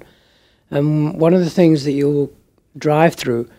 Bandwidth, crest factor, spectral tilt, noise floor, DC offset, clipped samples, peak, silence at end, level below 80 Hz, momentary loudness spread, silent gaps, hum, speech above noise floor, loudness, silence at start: 15.5 kHz; 16 dB; -7.5 dB/octave; -56 dBFS; under 0.1%; under 0.1%; -2 dBFS; 0.15 s; -54 dBFS; 9 LU; none; none; 40 dB; -16 LUFS; 0.7 s